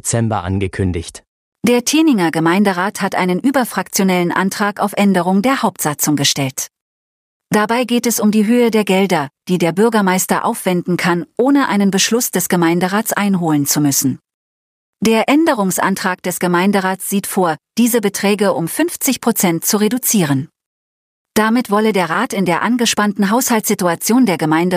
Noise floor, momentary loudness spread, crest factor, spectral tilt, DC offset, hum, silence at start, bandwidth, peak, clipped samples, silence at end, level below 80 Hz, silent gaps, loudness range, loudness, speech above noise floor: under -90 dBFS; 5 LU; 14 dB; -4.5 dB/octave; under 0.1%; none; 0.05 s; 15.5 kHz; 0 dBFS; under 0.1%; 0 s; -50 dBFS; 1.27-1.52 s, 6.82-7.40 s, 14.34-14.93 s, 20.66-21.25 s; 2 LU; -15 LUFS; over 75 dB